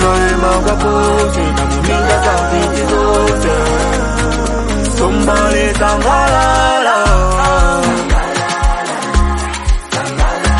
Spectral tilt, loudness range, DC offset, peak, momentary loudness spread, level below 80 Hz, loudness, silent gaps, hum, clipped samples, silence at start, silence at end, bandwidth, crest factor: -4.5 dB/octave; 2 LU; under 0.1%; 0 dBFS; 5 LU; -16 dBFS; -13 LUFS; none; none; under 0.1%; 0 s; 0 s; 11.5 kHz; 12 dB